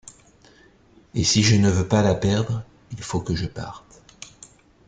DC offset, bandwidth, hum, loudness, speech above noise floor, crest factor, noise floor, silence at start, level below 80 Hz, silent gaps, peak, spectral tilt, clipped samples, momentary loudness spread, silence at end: under 0.1%; 9.4 kHz; none; -21 LUFS; 34 dB; 18 dB; -54 dBFS; 1.15 s; -48 dBFS; none; -6 dBFS; -5 dB/octave; under 0.1%; 24 LU; 0.6 s